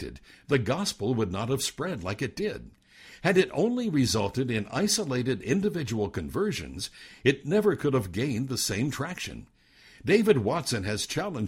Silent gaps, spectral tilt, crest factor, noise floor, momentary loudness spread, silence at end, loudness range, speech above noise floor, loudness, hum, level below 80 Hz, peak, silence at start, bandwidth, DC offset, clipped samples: none; -5 dB/octave; 20 dB; -55 dBFS; 10 LU; 0 s; 2 LU; 28 dB; -28 LUFS; none; -54 dBFS; -8 dBFS; 0 s; 16 kHz; under 0.1%; under 0.1%